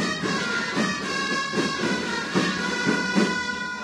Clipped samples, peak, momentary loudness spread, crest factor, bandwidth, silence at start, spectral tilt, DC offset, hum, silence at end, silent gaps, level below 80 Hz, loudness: under 0.1%; -8 dBFS; 3 LU; 16 dB; 13 kHz; 0 s; -4 dB/octave; under 0.1%; none; 0 s; none; -58 dBFS; -24 LUFS